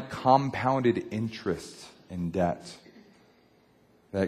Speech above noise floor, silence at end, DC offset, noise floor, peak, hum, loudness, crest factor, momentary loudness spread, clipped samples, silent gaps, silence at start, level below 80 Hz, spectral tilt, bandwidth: 35 dB; 0 s; under 0.1%; -62 dBFS; -6 dBFS; none; -28 LUFS; 22 dB; 21 LU; under 0.1%; none; 0 s; -54 dBFS; -7 dB/octave; 14.5 kHz